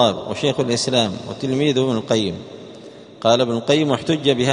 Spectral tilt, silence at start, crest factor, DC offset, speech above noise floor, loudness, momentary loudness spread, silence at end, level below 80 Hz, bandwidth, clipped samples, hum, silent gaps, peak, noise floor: -5 dB/octave; 0 s; 18 dB; under 0.1%; 21 dB; -19 LUFS; 16 LU; 0 s; -56 dBFS; 10.5 kHz; under 0.1%; none; none; -2 dBFS; -40 dBFS